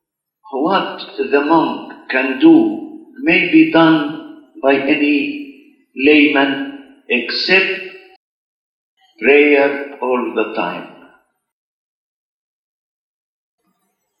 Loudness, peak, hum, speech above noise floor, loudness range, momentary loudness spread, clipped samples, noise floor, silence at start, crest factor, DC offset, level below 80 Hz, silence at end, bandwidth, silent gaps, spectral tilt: -14 LUFS; 0 dBFS; none; 55 dB; 8 LU; 18 LU; under 0.1%; -68 dBFS; 0.5 s; 16 dB; under 0.1%; -62 dBFS; 3.3 s; 6 kHz; 8.16-8.97 s; -7 dB/octave